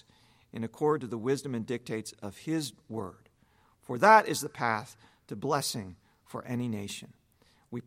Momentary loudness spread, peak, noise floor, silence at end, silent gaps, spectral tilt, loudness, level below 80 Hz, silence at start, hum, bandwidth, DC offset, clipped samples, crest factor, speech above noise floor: 21 LU; -6 dBFS; -66 dBFS; 0.05 s; none; -4.5 dB/octave; -30 LUFS; -72 dBFS; 0.55 s; none; 16.5 kHz; under 0.1%; under 0.1%; 26 dB; 36 dB